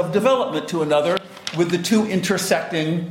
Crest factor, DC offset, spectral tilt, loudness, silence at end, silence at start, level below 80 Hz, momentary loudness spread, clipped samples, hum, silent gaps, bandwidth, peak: 14 dB; under 0.1%; -5 dB/octave; -20 LUFS; 0 s; 0 s; -60 dBFS; 5 LU; under 0.1%; none; none; 16.5 kHz; -6 dBFS